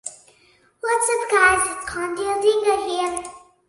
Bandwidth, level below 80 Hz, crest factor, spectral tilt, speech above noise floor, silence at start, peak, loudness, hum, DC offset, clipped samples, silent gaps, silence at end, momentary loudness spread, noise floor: 11.5 kHz; -52 dBFS; 18 dB; -1.5 dB/octave; 37 dB; 0.05 s; -4 dBFS; -20 LUFS; none; under 0.1%; under 0.1%; none; 0.3 s; 14 LU; -57 dBFS